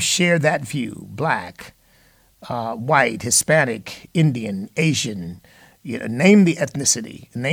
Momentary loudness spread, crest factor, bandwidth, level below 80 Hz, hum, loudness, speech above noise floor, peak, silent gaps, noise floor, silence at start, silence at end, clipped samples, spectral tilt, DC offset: 16 LU; 20 dB; 18 kHz; -58 dBFS; none; -19 LUFS; 36 dB; -2 dBFS; none; -55 dBFS; 0 s; 0 s; under 0.1%; -4 dB/octave; under 0.1%